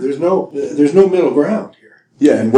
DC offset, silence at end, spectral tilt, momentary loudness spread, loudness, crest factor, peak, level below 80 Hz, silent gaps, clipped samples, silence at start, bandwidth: under 0.1%; 0 s; -7.5 dB/octave; 10 LU; -14 LUFS; 14 dB; 0 dBFS; -60 dBFS; none; 0.2%; 0 s; 10 kHz